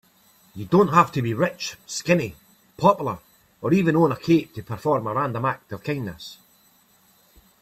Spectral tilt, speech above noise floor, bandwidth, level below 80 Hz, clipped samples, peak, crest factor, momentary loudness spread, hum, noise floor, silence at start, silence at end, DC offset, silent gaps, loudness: -6.5 dB/octave; 37 dB; 15 kHz; -58 dBFS; under 0.1%; -2 dBFS; 22 dB; 16 LU; none; -59 dBFS; 0.55 s; 1.25 s; under 0.1%; none; -22 LUFS